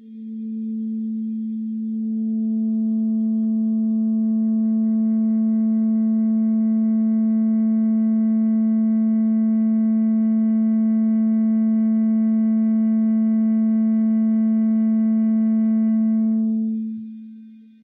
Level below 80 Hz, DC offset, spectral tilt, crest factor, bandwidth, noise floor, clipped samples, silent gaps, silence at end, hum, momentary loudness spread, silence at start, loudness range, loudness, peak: -78 dBFS; under 0.1%; -12.5 dB/octave; 6 dB; 2.1 kHz; -43 dBFS; under 0.1%; none; 0.3 s; none; 8 LU; 0.05 s; 3 LU; -20 LUFS; -14 dBFS